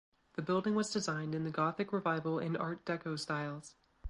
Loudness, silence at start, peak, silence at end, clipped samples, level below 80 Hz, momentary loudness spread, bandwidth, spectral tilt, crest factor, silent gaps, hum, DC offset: -36 LUFS; 0.35 s; -18 dBFS; 0 s; under 0.1%; -72 dBFS; 8 LU; 11.5 kHz; -5.5 dB/octave; 18 dB; none; none; under 0.1%